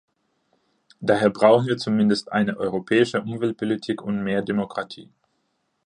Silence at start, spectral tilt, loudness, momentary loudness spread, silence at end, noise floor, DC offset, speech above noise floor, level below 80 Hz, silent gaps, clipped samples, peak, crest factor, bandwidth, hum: 1 s; -6.5 dB/octave; -22 LUFS; 11 LU; 0.8 s; -72 dBFS; under 0.1%; 51 dB; -62 dBFS; none; under 0.1%; -4 dBFS; 20 dB; 10 kHz; none